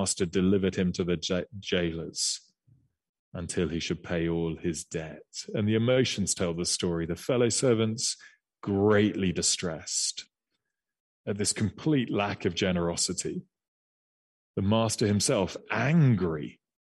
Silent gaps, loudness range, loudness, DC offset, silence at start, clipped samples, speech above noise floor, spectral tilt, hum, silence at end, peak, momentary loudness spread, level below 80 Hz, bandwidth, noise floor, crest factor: 3.09-3.32 s, 11.00-11.24 s, 13.68-14.54 s; 5 LU; -28 LUFS; under 0.1%; 0 s; under 0.1%; 56 dB; -4.5 dB/octave; none; 0.4 s; -10 dBFS; 12 LU; -56 dBFS; 12 kHz; -84 dBFS; 18 dB